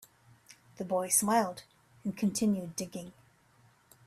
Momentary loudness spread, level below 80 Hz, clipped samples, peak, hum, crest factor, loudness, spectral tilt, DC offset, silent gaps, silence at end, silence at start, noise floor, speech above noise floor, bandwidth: 18 LU; -72 dBFS; under 0.1%; -12 dBFS; none; 22 dB; -31 LUFS; -4 dB/octave; under 0.1%; none; 0.95 s; 0.5 s; -65 dBFS; 34 dB; 15.5 kHz